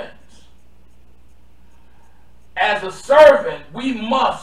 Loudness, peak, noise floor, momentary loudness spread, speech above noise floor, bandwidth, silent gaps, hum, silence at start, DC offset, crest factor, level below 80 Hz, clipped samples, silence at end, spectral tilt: -15 LUFS; 0 dBFS; -51 dBFS; 18 LU; 37 dB; 11 kHz; none; none; 0 s; 1%; 18 dB; -50 dBFS; under 0.1%; 0 s; -4 dB/octave